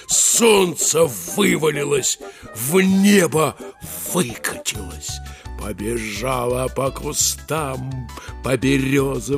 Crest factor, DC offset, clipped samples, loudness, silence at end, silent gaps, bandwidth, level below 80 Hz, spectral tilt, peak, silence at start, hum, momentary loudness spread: 18 dB; under 0.1%; under 0.1%; -19 LUFS; 0 s; none; 15.5 kHz; -40 dBFS; -3.5 dB/octave; -2 dBFS; 0 s; none; 16 LU